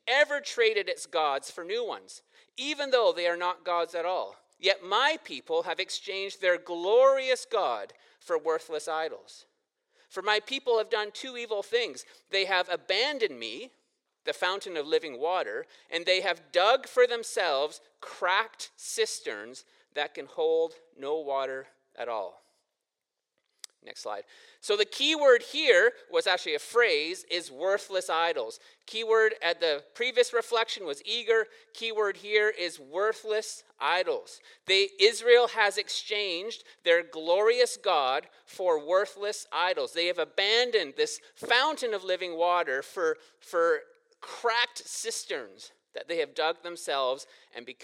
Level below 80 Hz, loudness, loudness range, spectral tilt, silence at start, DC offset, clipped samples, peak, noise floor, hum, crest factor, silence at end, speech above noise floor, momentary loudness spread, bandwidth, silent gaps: -90 dBFS; -28 LUFS; 7 LU; -0.5 dB/octave; 0.05 s; under 0.1%; under 0.1%; -8 dBFS; -87 dBFS; none; 22 dB; 0 s; 59 dB; 14 LU; 14 kHz; none